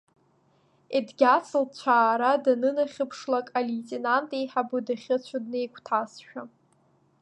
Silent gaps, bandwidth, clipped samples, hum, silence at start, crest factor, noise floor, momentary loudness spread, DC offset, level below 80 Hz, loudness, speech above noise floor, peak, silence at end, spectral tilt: none; 9.8 kHz; under 0.1%; none; 0.9 s; 20 dB; -65 dBFS; 11 LU; under 0.1%; -84 dBFS; -26 LUFS; 39 dB; -8 dBFS; 0.75 s; -4.5 dB/octave